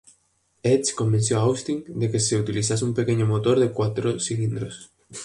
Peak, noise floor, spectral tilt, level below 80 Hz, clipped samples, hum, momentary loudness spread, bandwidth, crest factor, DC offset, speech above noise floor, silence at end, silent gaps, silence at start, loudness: -8 dBFS; -67 dBFS; -5.5 dB/octave; -54 dBFS; under 0.1%; none; 8 LU; 11.5 kHz; 16 dB; under 0.1%; 44 dB; 0 s; none; 0.65 s; -23 LUFS